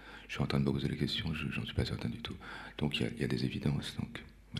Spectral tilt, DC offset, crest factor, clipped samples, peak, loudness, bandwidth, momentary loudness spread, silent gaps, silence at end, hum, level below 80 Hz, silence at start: -6 dB/octave; under 0.1%; 20 dB; under 0.1%; -16 dBFS; -36 LUFS; 13.5 kHz; 11 LU; none; 0 s; none; -50 dBFS; 0 s